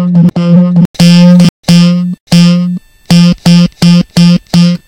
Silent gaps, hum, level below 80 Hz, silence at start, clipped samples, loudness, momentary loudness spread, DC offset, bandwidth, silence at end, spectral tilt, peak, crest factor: 0.85-0.94 s, 1.49-1.63 s, 2.20-2.27 s; none; -38 dBFS; 0 s; 8%; -6 LUFS; 5 LU; under 0.1%; 11 kHz; 0.1 s; -6.5 dB/octave; 0 dBFS; 6 dB